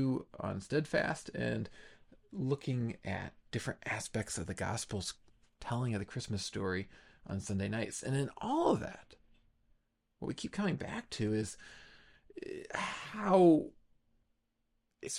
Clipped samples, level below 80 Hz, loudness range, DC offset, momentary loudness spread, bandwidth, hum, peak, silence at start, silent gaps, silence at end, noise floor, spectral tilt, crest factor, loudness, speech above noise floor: under 0.1%; -64 dBFS; 6 LU; under 0.1%; 16 LU; 13.5 kHz; none; -16 dBFS; 0 s; none; 0 s; -80 dBFS; -5.5 dB/octave; 22 dB; -36 LUFS; 44 dB